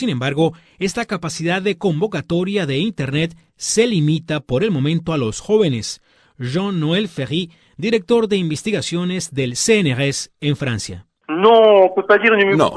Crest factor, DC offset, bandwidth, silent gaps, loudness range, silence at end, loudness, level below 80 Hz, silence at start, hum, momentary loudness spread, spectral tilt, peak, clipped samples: 18 dB; under 0.1%; 11 kHz; none; 5 LU; 0 s; -18 LUFS; -50 dBFS; 0 s; none; 12 LU; -5 dB/octave; 0 dBFS; under 0.1%